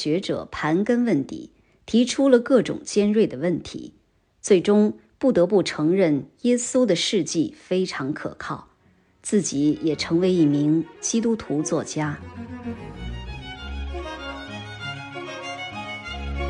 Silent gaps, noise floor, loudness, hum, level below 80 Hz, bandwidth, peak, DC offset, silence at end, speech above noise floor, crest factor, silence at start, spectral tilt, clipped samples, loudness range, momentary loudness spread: none; -60 dBFS; -23 LUFS; none; -44 dBFS; 10.5 kHz; -4 dBFS; under 0.1%; 0 s; 38 dB; 18 dB; 0 s; -5 dB/octave; under 0.1%; 12 LU; 16 LU